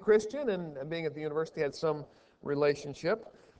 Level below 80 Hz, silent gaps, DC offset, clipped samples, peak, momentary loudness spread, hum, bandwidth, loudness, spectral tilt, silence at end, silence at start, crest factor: -68 dBFS; none; under 0.1%; under 0.1%; -14 dBFS; 9 LU; none; 8 kHz; -33 LUFS; -6 dB/octave; 0.3 s; 0 s; 18 dB